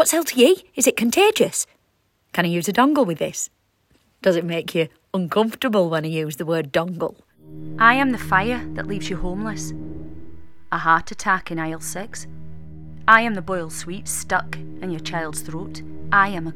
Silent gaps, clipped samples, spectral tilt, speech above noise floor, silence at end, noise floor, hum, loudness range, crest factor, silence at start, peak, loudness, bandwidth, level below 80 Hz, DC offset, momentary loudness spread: none; under 0.1%; -4 dB/octave; 45 dB; 0 s; -66 dBFS; none; 4 LU; 22 dB; 0 s; 0 dBFS; -21 LUFS; 17 kHz; -44 dBFS; under 0.1%; 18 LU